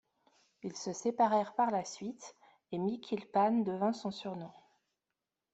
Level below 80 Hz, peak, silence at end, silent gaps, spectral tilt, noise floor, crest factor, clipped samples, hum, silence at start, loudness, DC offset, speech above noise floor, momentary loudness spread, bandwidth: -80 dBFS; -16 dBFS; 1.05 s; none; -5.5 dB/octave; -89 dBFS; 18 dB; under 0.1%; none; 0.65 s; -34 LUFS; under 0.1%; 56 dB; 16 LU; 8.2 kHz